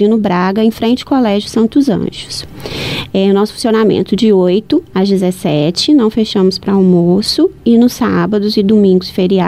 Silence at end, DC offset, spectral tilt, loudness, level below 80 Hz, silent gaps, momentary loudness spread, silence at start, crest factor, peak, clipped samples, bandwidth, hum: 0 s; under 0.1%; -6.5 dB/octave; -12 LUFS; -42 dBFS; none; 7 LU; 0 s; 10 dB; 0 dBFS; under 0.1%; 15 kHz; none